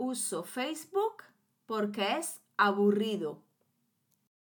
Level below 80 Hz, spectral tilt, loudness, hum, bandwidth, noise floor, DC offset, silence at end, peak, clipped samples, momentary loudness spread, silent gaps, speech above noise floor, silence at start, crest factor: under -90 dBFS; -4 dB/octave; -32 LUFS; none; 19 kHz; -77 dBFS; under 0.1%; 1.1 s; -12 dBFS; under 0.1%; 10 LU; none; 45 dB; 0 s; 22 dB